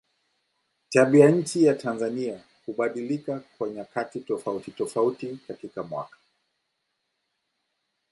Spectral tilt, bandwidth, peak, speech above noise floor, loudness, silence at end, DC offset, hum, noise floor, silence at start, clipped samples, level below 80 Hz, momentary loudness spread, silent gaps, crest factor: -6.5 dB/octave; 11.5 kHz; -4 dBFS; 53 dB; -25 LUFS; 2.05 s; under 0.1%; none; -78 dBFS; 0.9 s; under 0.1%; -74 dBFS; 18 LU; none; 24 dB